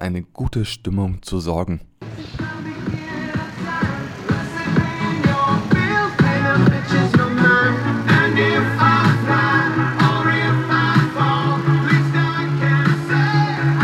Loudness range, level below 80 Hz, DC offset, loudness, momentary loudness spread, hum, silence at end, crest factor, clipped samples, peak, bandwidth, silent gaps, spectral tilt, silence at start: 10 LU; -40 dBFS; under 0.1%; -18 LUFS; 12 LU; none; 0 s; 16 dB; under 0.1%; 0 dBFS; 12 kHz; none; -7 dB/octave; 0 s